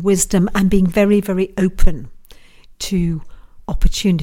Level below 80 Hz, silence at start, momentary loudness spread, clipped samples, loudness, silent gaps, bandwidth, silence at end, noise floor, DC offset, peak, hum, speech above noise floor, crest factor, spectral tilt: -22 dBFS; 0 s; 14 LU; under 0.1%; -17 LUFS; none; 16 kHz; 0 s; -41 dBFS; under 0.1%; 0 dBFS; none; 27 dB; 14 dB; -5.5 dB/octave